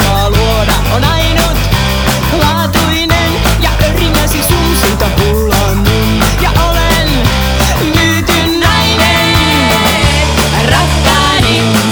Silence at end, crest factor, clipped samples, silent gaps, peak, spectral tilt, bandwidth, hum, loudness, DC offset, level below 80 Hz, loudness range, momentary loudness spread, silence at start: 0 s; 10 dB; under 0.1%; none; 0 dBFS; -4 dB/octave; over 20 kHz; none; -9 LUFS; under 0.1%; -16 dBFS; 2 LU; 3 LU; 0 s